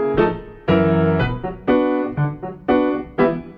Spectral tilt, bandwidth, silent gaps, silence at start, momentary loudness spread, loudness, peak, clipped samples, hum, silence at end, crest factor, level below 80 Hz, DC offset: -10 dB/octave; 5.4 kHz; none; 0 s; 8 LU; -19 LUFS; -4 dBFS; under 0.1%; none; 0 s; 16 dB; -40 dBFS; under 0.1%